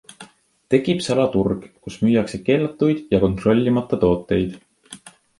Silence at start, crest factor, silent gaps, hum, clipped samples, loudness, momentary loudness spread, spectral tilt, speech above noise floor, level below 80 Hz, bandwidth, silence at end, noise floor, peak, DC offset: 0.2 s; 18 dB; none; none; under 0.1%; -20 LUFS; 11 LU; -7 dB/octave; 27 dB; -44 dBFS; 11.5 kHz; 0.3 s; -46 dBFS; -2 dBFS; under 0.1%